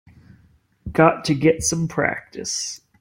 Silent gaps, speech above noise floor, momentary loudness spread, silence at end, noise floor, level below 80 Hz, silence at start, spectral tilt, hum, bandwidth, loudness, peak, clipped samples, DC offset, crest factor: none; 37 dB; 12 LU; 0.25 s; -57 dBFS; -48 dBFS; 0.85 s; -4.5 dB/octave; none; 16.5 kHz; -21 LUFS; -2 dBFS; under 0.1%; under 0.1%; 20 dB